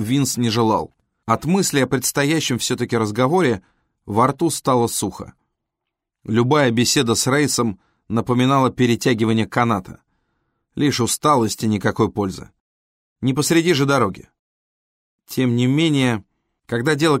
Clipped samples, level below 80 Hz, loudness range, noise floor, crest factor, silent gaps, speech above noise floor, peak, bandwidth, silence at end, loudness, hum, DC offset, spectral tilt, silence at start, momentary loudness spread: under 0.1%; -52 dBFS; 3 LU; -81 dBFS; 16 dB; 12.60-13.16 s, 14.39-15.19 s; 63 dB; -4 dBFS; 16 kHz; 0 s; -19 LUFS; none; under 0.1%; -4.5 dB/octave; 0 s; 10 LU